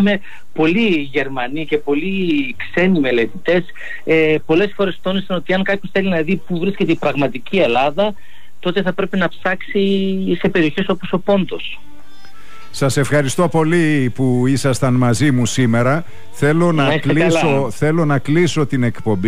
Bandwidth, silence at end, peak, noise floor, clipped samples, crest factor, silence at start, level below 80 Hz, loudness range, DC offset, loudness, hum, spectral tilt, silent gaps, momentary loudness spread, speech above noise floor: 15 kHz; 0 s; -6 dBFS; -45 dBFS; under 0.1%; 12 dB; 0 s; -50 dBFS; 3 LU; 6%; -17 LUFS; none; -6 dB/octave; none; 7 LU; 29 dB